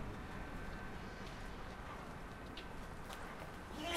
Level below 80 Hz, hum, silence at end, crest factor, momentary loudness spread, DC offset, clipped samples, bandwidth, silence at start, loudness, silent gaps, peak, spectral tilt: -54 dBFS; none; 0 s; 22 dB; 2 LU; under 0.1%; under 0.1%; 16 kHz; 0 s; -49 LUFS; none; -26 dBFS; -4.5 dB/octave